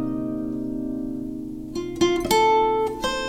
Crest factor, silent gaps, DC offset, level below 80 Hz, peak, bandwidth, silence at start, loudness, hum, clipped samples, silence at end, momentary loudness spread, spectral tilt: 18 dB; none; under 0.1%; -44 dBFS; -6 dBFS; 16 kHz; 0 s; -24 LUFS; none; under 0.1%; 0 s; 13 LU; -4.5 dB/octave